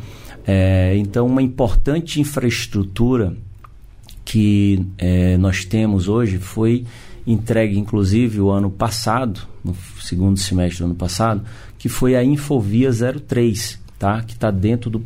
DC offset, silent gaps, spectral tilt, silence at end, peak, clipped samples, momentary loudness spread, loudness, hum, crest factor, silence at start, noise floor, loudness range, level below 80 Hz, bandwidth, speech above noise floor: under 0.1%; none; -6.5 dB/octave; 0 s; -6 dBFS; under 0.1%; 10 LU; -18 LUFS; none; 12 dB; 0 s; -40 dBFS; 2 LU; -30 dBFS; 16 kHz; 23 dB